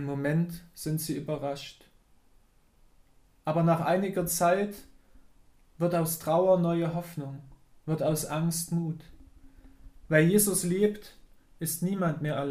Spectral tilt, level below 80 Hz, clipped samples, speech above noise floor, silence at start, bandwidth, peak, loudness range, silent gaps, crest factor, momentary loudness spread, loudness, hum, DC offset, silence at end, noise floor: -5.5 dB/octave; -58 dBFS; under 0.1%; 34 dB; 0 s; 15.5 kHz; -8 dBFS; 5 LU; none; 22 dB; 15 LU; -28 LUFS; none; under 0.1%; 0 s; -61 dBFS